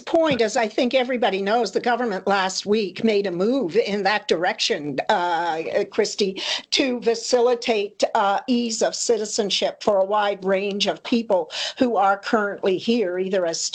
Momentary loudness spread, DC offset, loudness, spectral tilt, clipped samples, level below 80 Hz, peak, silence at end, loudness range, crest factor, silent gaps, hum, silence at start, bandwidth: 3 LU; under 0.1%; -21 LUFS; -3 dB/octave; under 0.1%; -66 dBFS; -4 dBFS; 0 s; 1 LU; 18 dB; none; none; 0 s; 9.2 kHz